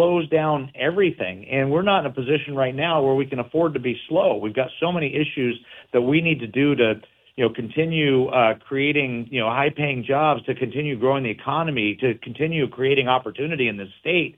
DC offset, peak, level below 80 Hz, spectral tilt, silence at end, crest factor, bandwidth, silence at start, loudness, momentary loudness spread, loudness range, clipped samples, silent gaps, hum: under 0.1%; -4 dBFS; -60 dBFS; -8.5 dB/octave; 0.05 s; 18 dB; 4 kHz; 0 s; -22 LUFS; 6 LU; 2 LU; under 0.1%; none; none